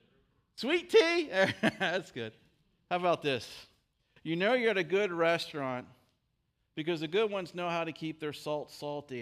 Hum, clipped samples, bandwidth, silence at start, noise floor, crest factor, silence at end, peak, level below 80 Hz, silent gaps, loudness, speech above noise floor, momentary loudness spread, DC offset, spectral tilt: none; under 0.1%; 15 kHz; 0.55 s; -78 dBFS; 20 dB; 0 s; -12 dBFS; -74 dBFS; none; -31 LUFS; 47 dB; 14 LU; under 0.1%; -5 dB/octave